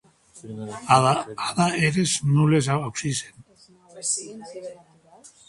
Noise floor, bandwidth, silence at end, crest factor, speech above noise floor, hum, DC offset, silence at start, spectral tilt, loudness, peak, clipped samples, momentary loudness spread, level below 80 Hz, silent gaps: -54 dBFS; 11.5 kHz; 0.75 s; 22 dB; 31 dB; none; under 0.1%; 0.35 s; -4.5 dB/octave; -22 LUFS; -2 dBFS; under 0.1%; 19 LU; -58 dBFS; none